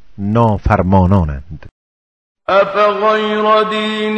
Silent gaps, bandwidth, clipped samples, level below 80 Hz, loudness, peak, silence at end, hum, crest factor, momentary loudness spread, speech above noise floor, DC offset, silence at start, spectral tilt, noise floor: 1.71-2.35 s; 8.8 kHz; under 0.1%; -30 dBFS; -13 LUFS; 0 dBFS; 0 s; none; 14 dB; 6 LU; over 77 dB; under 0.1%; 0.2 s; -7.5 dB/octave; under -90 dBFS